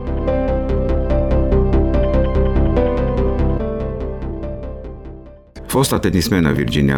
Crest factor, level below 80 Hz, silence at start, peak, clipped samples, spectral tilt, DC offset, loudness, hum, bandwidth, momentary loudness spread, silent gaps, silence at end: 14 dB; -20 dBFS; 0 s; -2 dBFS; under 0.1%; -6.5 dB/octave; 0.7%; -18 LUFS; none; 18 kHz; 13 LU; none; 0 s